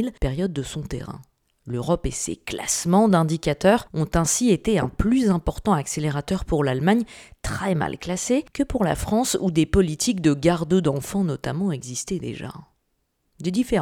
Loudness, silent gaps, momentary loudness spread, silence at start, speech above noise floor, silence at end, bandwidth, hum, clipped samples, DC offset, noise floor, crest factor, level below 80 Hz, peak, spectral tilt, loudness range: -23 LUFS; none; 11 LU; 0 s; 50 dB; 0 s; 17.5 kHz; none; under 0.1%; under 0.1%; -72 dBFS; 20 dB; -38 dBFS; -2 dBFS; -5.5 dB/octave; 4 LU